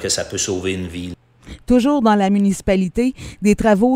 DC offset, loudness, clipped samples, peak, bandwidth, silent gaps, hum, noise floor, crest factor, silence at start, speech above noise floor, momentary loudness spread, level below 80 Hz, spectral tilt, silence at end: under 0.1%; -17 LUFS; under 0.1%; 0 dBFS; 15.5 kHz; none; none; -39 dBFS; 16 dB; 0 s; 23 dB; 13 LU; -38 dBFS; -5 dB/octave; 0 s